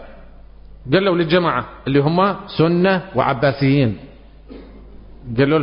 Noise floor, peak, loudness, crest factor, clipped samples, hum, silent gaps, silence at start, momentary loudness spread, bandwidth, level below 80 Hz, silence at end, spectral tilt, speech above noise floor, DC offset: -40 dBFS; -2 dBFS; -17 LUFS; 16 dB; under 0.1%; none; none; 0 s; 7 LU; 5.4 kHz; -42 dBFS; 0 s; -12 dB/octave; 23 dB; under 0.1%